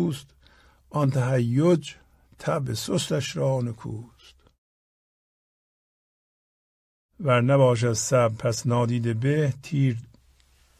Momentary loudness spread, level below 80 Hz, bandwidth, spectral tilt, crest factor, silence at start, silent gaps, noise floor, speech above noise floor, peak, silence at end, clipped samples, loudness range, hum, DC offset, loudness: 13 LU; -58 dBFS; 14.5 kHz; -6 dB/octave; 18 dB; 0 s; 4.58-7.09 s; -60 dBFS; 36 dB; -6 dBFS; 0.75 s; under 0.1%; 10 LU; none; under 0.1%; -24 LUFS